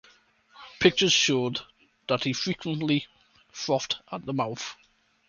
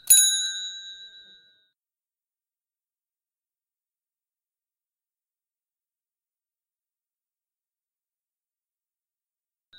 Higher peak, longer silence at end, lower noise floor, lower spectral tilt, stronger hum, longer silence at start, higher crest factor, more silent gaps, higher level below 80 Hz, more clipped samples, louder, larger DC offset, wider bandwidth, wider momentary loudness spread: about the same, -4 dBFS vs -2 dBFS; second, 0.55 s vs 8.7 s; second, -60 dBFS vs under -90 dBFS; first, -3.5 dB/octave vs 5 dB/octave; neither; first, 0.55 s vs 0.05 s; second, 24 dB vs 30 dB; neither; first, -64 dBFS vs -72 dBFS; neither; second, -26 LUFS vs -19 LUFS; neither; second, 7.4 kHz vs 16 kHz; second, 16 LU vs 25 LU